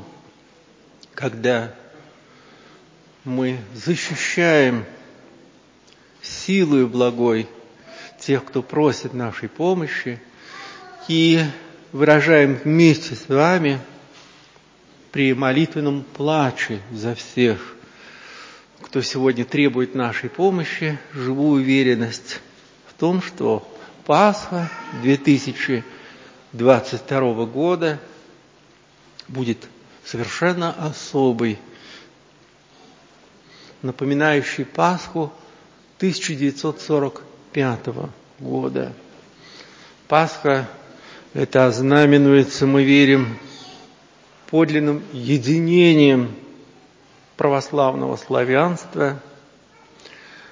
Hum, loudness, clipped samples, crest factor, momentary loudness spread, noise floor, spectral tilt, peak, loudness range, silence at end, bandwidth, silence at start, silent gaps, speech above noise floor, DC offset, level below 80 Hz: none; -19 LUFS; under 0.1%; 20 dB; 19 LU; -52 dBFS; -6 dB/octave; 0 dBFS; 8 LU; 0.45 s; 7.6 kHz; 0 s; none; 34 dB; under 0.1%; -62 dBFS